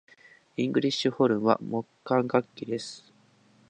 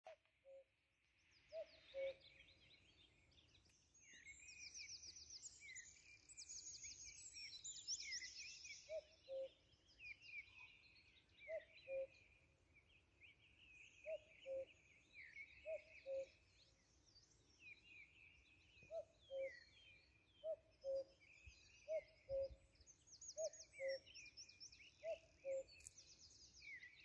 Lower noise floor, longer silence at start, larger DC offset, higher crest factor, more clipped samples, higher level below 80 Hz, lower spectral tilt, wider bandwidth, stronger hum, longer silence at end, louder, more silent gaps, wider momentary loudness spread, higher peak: second, -61 dBFS vs -84 dBFS; first, 0.6 s vs 0.05 s; neither; about the same, 22 dB vs 20 dB; neither; first, -72 dBFS vs -80 dBFS; first, -6 dB/octave vs -0.5 dB/octave; first, 9.8 kHz vs 8.4 kHz; neither; first, 0.7 s vs 0 s; first, -27 LUFS vs -54 LUFS; neither; second, 12 LU vs 17 LU; first, -6 dBFS vs -36 dBFS